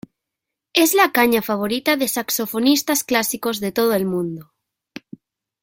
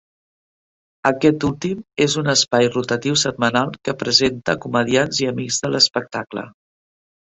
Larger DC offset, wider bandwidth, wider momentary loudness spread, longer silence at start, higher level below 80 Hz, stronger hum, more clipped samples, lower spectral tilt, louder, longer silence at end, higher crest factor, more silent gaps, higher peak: neither; first, 17 kHz vs 8.4 kHz; about the same, 10 LU vs 10 LU; second, 0.75 s vs 1.05 s; second, -60 dBFS vs -52 dBFS; neither; neither; about the same, -3 dB/octave vs -3.5 dB/octave; about the same, -19 LUFS vs -18 LUFS; first, 1.2 s vs 0.9 s; about the same, 18 dB vs 20 dB; neither; about the same, -2 dBFS vs 0 dBFS